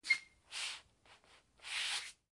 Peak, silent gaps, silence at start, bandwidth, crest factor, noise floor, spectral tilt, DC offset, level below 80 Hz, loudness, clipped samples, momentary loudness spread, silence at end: -20 dBFS; none; 0.05 s; 11.5 kHz; 24 dB; -66 dBFS; 3 dB/octave; under 0.1%; -80 dBFS; -40 LUFS; under 0.1%; 14 LU; 0.2 s